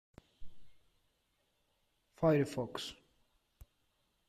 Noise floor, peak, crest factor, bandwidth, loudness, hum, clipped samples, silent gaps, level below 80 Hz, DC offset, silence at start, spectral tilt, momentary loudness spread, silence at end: -79 dBFS; -20 dBFS; 22 dB; 14.5 kHz; -35 LUFS; none; under 0.1%; none; -64 dBFS; under 0.1%; 0.4 s; -6.5 dB/octave; 13 LU; 1.35 s